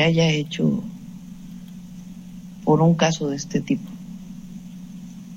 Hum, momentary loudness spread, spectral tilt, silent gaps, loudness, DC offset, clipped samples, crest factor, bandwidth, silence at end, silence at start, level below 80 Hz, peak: none; 21 LU; -6 dB/octave; none; -21 LUFS; under 0.1%; under 0.1%; 20 dB; 7.8 kHz; 0 s; 0 s; -52 dBFS; -2 dBFS